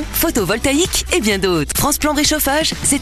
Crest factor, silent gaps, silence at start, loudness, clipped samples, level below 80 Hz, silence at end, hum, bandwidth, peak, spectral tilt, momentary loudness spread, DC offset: 14 dB; none; 0 s; -15 LUFS; under 0.1%; -30 dBFS; 0 s; none; 14 kHz; -2 dBFS; -3 dB/octave; 2 LU; under 0.1%